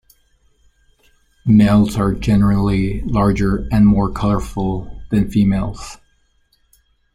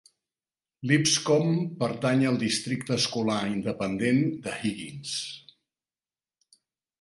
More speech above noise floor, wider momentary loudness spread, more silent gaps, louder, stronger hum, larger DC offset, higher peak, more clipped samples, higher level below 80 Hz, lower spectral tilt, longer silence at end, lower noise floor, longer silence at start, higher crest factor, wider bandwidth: second, 45 dB vs over 64 dB; about the same, 11 LU vs 11 LU; neither; first, -16 LUFS vs -26 LUFS; neither; neither; first, -2 dBFS vs -6 dBFS; neither; first, -30 dBFS vs -64 dBFS; first, -8 dB/octave vs -4.5 dB/octave; second, 1.2 s vs 1.6 s; second, -59 dBFS vs under -90 dBFS; first, 1.45 s vs 0.8 s; second, 14 dB vs 22 dB; about the same, 12 kHz vs 11.5 kHz